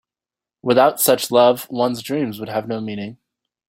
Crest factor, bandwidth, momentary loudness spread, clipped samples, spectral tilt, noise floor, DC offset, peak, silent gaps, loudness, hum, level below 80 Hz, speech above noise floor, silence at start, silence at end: 18 dB; 16.5 kHz; 14 LU; under 0.1%; -4 dB/octave; -90 dBFS; under 0.1%; -2 dBFS; none; -18 LUFS; none; -64 dBFS; 72 dB; 0.65 s; 0.55 s